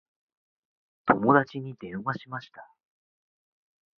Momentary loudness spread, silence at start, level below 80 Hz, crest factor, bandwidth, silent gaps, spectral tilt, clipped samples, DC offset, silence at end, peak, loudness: 17 LU; 1.05 s; -66 dBFS; 26 dB; 6.4 kHz; none; -8.5 dB/octave; under 0.1%; under 0.1%; 1.35 s; -4 dBFS; -26 LUFS